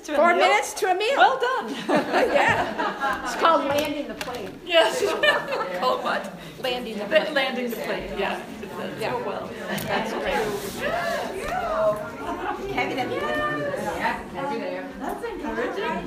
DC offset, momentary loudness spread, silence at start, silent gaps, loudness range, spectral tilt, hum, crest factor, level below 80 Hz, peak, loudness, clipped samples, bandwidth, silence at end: under 0.1%; 12 LU; 0 s; none; 6 LU; -3.5 dB/octave; none; 20 dB; -52 dBFS; -4 dBFS; -24 LUFS; under 0.1%; 15.5 kHz; 0 s